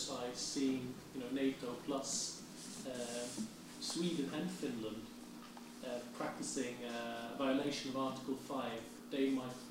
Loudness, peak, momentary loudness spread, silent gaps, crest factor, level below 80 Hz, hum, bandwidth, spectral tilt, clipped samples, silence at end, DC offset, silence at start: -41 LUFS; -24 dBFS; 11 LU; none; 16 dB; -74 dBFS; none; 16 kHz; -3.5 dB/octave; under 0.1%; 0 s; under 0.1%; 0 s